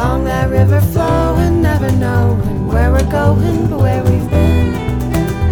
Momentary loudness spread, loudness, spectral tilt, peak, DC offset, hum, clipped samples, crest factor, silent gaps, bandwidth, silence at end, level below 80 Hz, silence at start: 4 LU; -14 LUFS; -8 dB/octave; 0 dBFS; under 0.1%; none; under 0.1%; 12 dB; none; 19 kHz; 0 s; -20 dBFS; 0 s